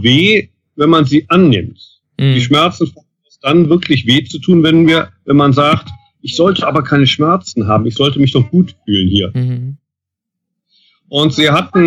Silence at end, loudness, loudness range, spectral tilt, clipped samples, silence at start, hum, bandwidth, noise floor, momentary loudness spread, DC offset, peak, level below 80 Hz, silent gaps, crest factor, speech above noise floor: 0 s; -12 LUFS; 4 LU; -6.5 dB/octave; under 0.1%; 0 s; none; 10.5 kHz; -80 dBFS; 10 LU; under 0.1%; 0 dBFS; -46 dBFS; none; 12 dB; 69 dB